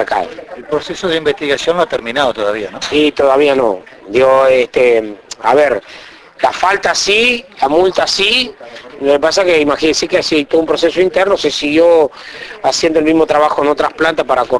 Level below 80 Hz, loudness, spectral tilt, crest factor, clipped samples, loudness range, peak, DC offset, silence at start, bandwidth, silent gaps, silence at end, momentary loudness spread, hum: -44 dBFS; -12 LUFS; -3 dB/octave; 12 dB; under 0.1%; 2 LU; 0 dBFS; under 0.1%; 0 s; 11 kHz; none; 0 s; 10 LU; none